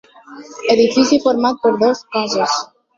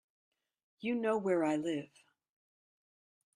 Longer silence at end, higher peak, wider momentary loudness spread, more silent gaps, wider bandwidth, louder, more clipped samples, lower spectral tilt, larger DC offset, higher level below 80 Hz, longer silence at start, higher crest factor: second, 0.35 s vs 1.5 s; first, -2 dBFS vs -20 dBFS; about the same, 8 LU vs 10 LU; neither; second, 7.6 kHz vs 11 kHz; first, -15 LUFS vs -35 LUFS; neither; second, -3.5 dB/octave vs -6 dB/octave; neither; first, -58 dBFS vs -82 dBFS; second, 0.3 s vs 0.8 s; about the same, 16 dB vs 18 dB